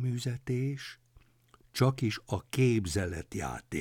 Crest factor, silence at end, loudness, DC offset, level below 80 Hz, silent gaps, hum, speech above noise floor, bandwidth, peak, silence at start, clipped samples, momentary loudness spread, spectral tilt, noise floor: 18 dB; 0 s; -32 LUFS; under 0.1%; -56 dBFS; none; none; 32 dB; 16 kHz; -14 dBFS; 0 s; under 0.1%; 10 LU; -6 dB/octave; -64 dBFS